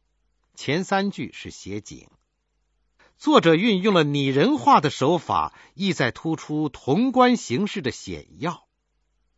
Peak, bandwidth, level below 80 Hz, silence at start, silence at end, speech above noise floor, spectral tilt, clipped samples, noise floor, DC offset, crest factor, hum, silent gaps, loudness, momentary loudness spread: -2 dBFS; 8 kHz; -58 dBFS; 0.6 s; 0.8 s; 50 dB; -5.5 dB/octave; under 0.1%; -72 dBFS; under 0.1%; 20 dB; none; none; -21 LUFS; 17 LU